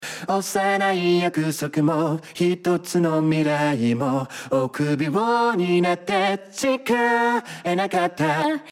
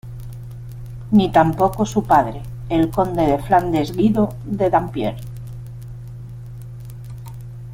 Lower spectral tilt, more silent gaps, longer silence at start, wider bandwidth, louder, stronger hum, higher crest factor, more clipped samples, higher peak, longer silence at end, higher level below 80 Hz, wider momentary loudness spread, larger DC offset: second, -5.5 dB/octave vs -7.5 dB/octave; neither; about the same, 0 s vs 0.05 s; about the same, 16 kHz vs 16.5 kHz; second, -22 LUFS vs -18 LUFS; neither; about the same, 14 dB vs 18 dB; neither; second, -8 dBFS vs -2 dBFS; about the same, 0 s vs 0 s; second, -66 dBFS vs -38 dBFS; second, 5 LU vs 19 LU; neither